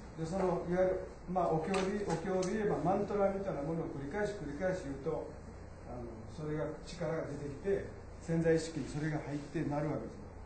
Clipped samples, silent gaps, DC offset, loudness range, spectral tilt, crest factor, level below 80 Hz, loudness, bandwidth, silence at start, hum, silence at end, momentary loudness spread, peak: under 0.1%; none; under 0.1%; 6 LU; -6.5 dB/octave; 16 dB; -54 dBFS; -36 LUFS; 8.8 kHz; 0 s; none; 0 s; 13 LU; -20 dBFS